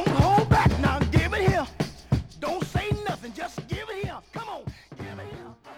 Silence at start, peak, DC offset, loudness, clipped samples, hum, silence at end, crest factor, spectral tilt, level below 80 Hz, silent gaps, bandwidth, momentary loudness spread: 0 s; -8 dBFS; under 0.1%; -25 LUFS; under 0.1%; none; 0 s; 18 dB; -6.5 dB/octave; -36 dBFS; none; 16 kHz; 19 LU